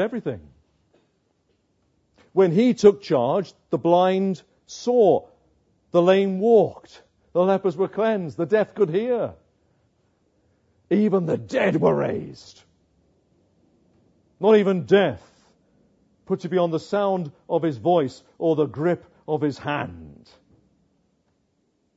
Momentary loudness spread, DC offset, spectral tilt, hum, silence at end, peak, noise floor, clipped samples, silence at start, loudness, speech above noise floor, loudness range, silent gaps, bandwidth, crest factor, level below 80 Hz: 12 LU; under 0.1%; -7 dB/octave; none; 1.85 s; -2 dBFS; -69 dBFS; under 0.1%; 0 s; -22 LUFS; 48 dB; 5 LU; none; 8 kHz; 20 dB; -66 dBFS